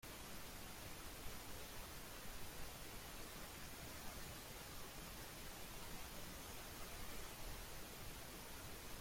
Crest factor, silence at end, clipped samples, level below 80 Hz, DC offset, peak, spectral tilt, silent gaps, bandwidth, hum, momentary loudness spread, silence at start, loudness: 14 dB; 0 s; under 0.1%; -60 dBFS; under 0.1%; -36 dBFS; -3 dB/octave; none; 16.5 kHz; none; 1 LU; 0 s; -53 LUFS